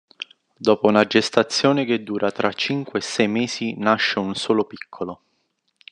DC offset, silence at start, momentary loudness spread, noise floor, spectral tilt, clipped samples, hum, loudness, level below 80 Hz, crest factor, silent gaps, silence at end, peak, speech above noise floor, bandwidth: under 0.1%; 0.2 s; 15 LU; -71 dBFS; -4.5 dB/octave; under 0.1%; none; -20 LUFS; -68 dBFS; 22 dB; none; 0.8 s; 0 dBFS; 50 dB; 10.5 kHz